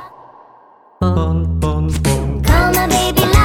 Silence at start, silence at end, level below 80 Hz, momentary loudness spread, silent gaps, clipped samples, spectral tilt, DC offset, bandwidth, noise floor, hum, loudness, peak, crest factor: 0 s; 0 s; -20 dBFS; 5 LU; none; under 0.1%; -5 dB/octave; under 0.1%; 19 kHz; -46 dBFS; none; -15 LUFS; 0 dBFS; 14 dB